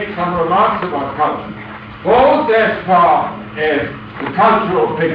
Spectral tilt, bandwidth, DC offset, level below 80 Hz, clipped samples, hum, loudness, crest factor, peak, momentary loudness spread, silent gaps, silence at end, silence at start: -8.5 dB/octave; 5.2 kHz; under 0.1%; -44 dBFS; under 0.1%; none; -14 LUFS; 12 dB; -2 dBFS; 14 LU; none; 0 s; 0 s